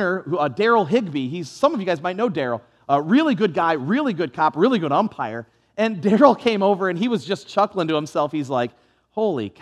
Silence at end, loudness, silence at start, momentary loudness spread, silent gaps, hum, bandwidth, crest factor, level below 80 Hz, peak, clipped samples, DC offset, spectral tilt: 0.1 s; -21 LUFS; 0 s; 9 LU; none; none; 11.5 kHz; 20 dB; -70 dBFS; 0 dBFS; under 0.1%; under 0.1%; -6.5 dB/octave